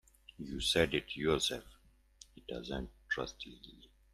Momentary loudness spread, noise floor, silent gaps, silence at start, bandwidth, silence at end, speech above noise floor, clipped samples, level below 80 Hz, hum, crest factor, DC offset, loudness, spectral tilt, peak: 19 LU; -62 dBFS; none; 0.4 s; 14.5 kHz; 0.3 s; 25 dB; under 0.1%; -54 dBFS; none; 24 dB; under 0.1%; -36 LUFS; -3.5 dB/octave; -14 dBFS